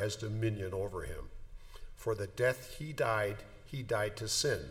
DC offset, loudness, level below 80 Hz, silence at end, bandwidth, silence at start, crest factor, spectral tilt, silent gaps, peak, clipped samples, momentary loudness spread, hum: under 0.1%; -36 LUFS; -52 dBFS; 0 s; 18 kHz; 0 s; 18 dB; -4 dB/octave; none; -18 dBFS; under 0.1%; 16 LU; none